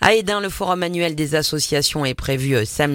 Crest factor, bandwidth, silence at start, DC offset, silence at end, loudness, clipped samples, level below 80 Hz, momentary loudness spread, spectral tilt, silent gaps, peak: 18 dB; 17 kHz; 0 s; under 0.1%; 0 s; -20 LUFS; under 0.1%; -40 dBFS; 4 LU; -4 dB/octave; none; 0 dBFS